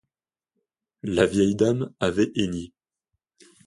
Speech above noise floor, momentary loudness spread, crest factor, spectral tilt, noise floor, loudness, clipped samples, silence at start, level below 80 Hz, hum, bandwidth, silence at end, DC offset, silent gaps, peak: over 67 dB; 14 LU; 20 dB; -6 dB/octave; under -90 dBFS; -23 LUFS; under 0.1%; 1.05 s; -52 dBFS; none; 11.5 kHz; 1 s; under 0.1%; none; -6 dBFS